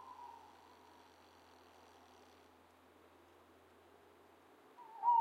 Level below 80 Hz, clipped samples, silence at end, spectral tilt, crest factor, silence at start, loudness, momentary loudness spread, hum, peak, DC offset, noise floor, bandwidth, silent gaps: -86 dBFS; under 0.1%; 0 s; -3.5 dB/octave; 22 dB; 0.05 s; -42 LUFS; 10 LU; none; -24 dBFS; under 0.1%; -66 dBFS; 15 kHz; none